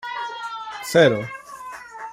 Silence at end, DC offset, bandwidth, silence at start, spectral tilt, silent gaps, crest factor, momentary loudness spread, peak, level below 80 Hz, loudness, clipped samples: 0 s; under 0.1%; 16 kHz; 0 s; -5 dB/octave; none; 20 dB; 20 LU; -2 dBFS; -62 dBFS; -21 LUFS; under 0.1%